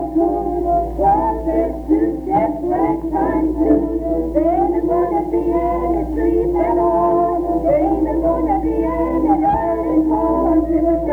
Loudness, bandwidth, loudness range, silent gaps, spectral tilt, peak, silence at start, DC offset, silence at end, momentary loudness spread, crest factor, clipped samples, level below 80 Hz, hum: -17 LUFS; 3.3 kHz; 1 LU; none; -10 dB/octave; -2 dBFS; 0 s; under 0.1%; 0 s; 3 LU; 14 dB; under 0.1%; -30 dBFS; none